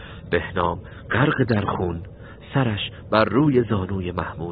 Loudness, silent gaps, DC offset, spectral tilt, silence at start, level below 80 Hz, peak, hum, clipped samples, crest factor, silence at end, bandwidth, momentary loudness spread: -22 LUFS; none; under 0.1%; -10.5 dB/octave; 0 s; -44 dBFS; -2 dBFS; none; under 0.1%; 20 dB; 0 s; 5 kHz; 10 LU